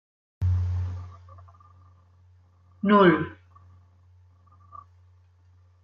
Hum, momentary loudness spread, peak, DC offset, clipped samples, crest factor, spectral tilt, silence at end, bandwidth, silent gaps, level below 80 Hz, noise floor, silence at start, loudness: none; 30 LU; -6 dBFS; under 0.1%; under 0.1%; 22 dB; -9 dB/octave; 2.5 s; 5.2 kHz; none; -56 dBFS; -58 dBFS; 0.4 s; -23 LUFS